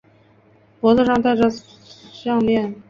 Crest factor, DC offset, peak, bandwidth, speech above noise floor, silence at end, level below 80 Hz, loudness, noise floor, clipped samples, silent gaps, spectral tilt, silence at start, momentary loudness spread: 18 dB; under 0.1%; -2 dBFS; 7.2 kHz; 36 dB; 0.1 s; -52 dBFS; -18 LUFS; -53 dBFS; under 0.1%; none; -6.5 dB/octave; 0.85 s; 10 LU